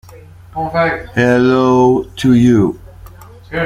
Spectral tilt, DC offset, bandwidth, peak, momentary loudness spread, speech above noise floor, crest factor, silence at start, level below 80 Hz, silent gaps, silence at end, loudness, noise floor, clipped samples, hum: -7 dB/octave; under 0.1%; 13 kHz; -2 dBFS; 14 LU; 26 dB; 12 dB; 0.15 s; -40 dBFS; none; 0 s; -13 LUFS; -37 dBFS; under 0.1%; none